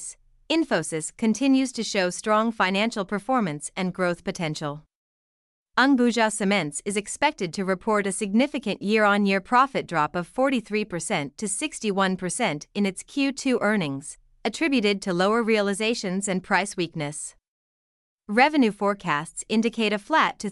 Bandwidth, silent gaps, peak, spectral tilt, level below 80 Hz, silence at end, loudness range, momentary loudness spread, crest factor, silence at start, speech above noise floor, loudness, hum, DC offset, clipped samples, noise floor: 12 kHz; 4.95-5.66 s, 17.48-18.19 s; -6 dBFS; -4 dB/octave; -60 dBFS; 0 s; 3 LU; 9 LU; 20 dB; 0 s; over 66 dB; -24 LUFS; none; under 0.1%; under 0.1%; under -90 dBFS